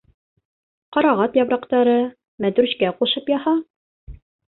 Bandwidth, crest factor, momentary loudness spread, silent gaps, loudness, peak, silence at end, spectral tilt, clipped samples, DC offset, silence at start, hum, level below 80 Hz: 4.2 kHz; 16 dB; 7 LU; 2.28-2.38 s, 3.70-4.07 s; -20 LUFS; -4 dBFS; 0.45 s; -10 dB/octave; under 0.1%; under 0.1%; 0.9 s; none; -52 dBFS